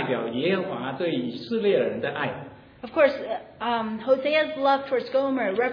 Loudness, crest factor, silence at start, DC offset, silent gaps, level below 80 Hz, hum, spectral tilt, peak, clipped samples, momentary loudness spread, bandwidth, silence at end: -25 LUFS; 20 dB; 0 s; under 0.1%; none; -66 dBFS; none; -7.5 dB/octave; -6 dBFS; under 0.1%; 9 LU; 5.2 kHz; 0 s